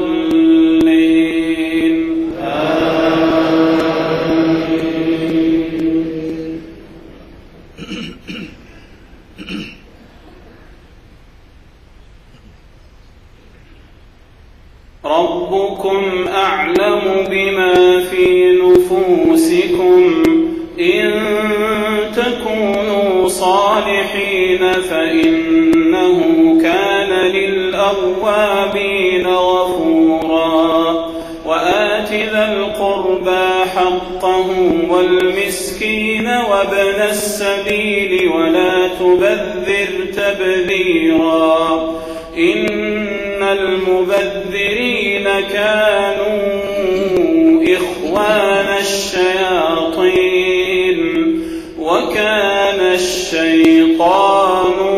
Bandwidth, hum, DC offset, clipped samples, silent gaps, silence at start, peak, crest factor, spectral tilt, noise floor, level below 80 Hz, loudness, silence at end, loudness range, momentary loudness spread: 15 kHz; none; under 0.1%; under 0.1%; none; 0 s; 0 dBFS; 14 dB; -4.5 dB/octave; -42 dBFS; -42 dBFS; -13 LUFS; 0 s; 8 LU; 7 LU